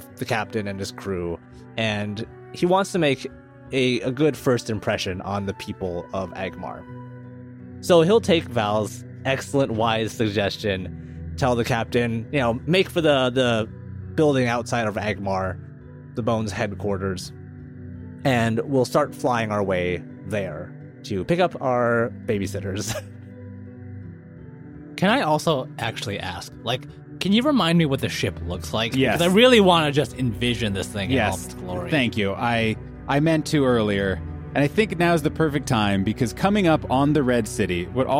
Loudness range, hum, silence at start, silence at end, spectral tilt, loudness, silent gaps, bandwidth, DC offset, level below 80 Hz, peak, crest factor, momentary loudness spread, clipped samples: 7 LU; none; 0 s; 0 s; -5.5 dB/octave; -22 LUFS; none; 16.5 kHz; under 0.1%; -46 dBFS; -2 dBFS; 20 dB; 18 LU; under 0.1%